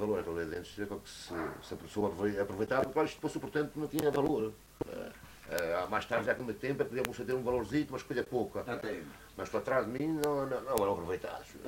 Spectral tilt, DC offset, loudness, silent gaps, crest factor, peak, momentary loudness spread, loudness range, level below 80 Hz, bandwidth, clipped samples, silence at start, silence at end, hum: -5.5 dB/octave; under 0.1%; -35 LUFS; none; 26 dB; -8 dBFS; 10 LU; 2 LU; -60 dBFS; 16 kHz; under 0.1%; 0 s; 0 s; none